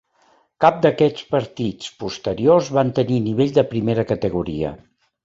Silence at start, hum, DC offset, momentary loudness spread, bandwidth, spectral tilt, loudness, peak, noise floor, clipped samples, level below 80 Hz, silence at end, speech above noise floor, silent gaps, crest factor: 0.6 s; none; under 0.1%; 11 LU; 8 kHz; -7 dB/octave; -20 LUFS; -2 dBFS; -59 dBFS; under 0.1%; -48 dBFS; 0.5 s; 40 dB; none; 18 dB